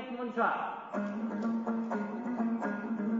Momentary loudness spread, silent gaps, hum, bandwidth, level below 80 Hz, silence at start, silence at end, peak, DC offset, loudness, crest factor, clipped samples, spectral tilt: 6 LU; none; none; 7.4 kHz; -80 dBFS; 0 s; 0 s; -16 dBFS; under 0.1%; -34 LUFS; 18 dB; under 0.1%; -6 dB/octave